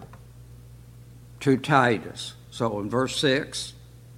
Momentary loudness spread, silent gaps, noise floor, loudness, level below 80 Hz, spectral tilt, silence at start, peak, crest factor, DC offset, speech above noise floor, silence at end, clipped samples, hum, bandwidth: 16 LU; none; -47 dBFS; -25 LUFS; -54 dBFS; -5 dB/octave; 0 s; -4 dBFS; 24 dB; under 0.1%; 22 dB; 0 s; under 0.1%; none; 16.5 kHz